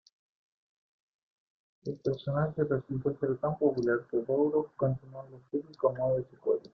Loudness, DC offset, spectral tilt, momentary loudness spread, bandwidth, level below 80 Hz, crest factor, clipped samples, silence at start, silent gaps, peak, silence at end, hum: -31 LUFS; under 0.1%; -9.5 dB/octave; 10 LU; 6.2 kHz; -64 dBFS; 18 dB; under 0.1%; 1.85 s; none; -14 dBFS; 0.05 s; none